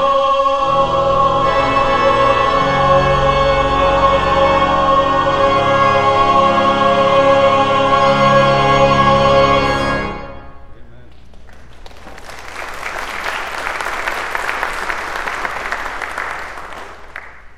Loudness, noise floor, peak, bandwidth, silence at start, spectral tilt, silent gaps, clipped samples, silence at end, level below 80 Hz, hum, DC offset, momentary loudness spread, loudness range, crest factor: -14 LUFS; -40 dBFS; 0 dBFS; 14 kHz; 0 s; -5 dB/octave; none; under 0.1%; 0.05 s; -32 dBFS; none; 2%; 15 LU; 13 LU; 14 dB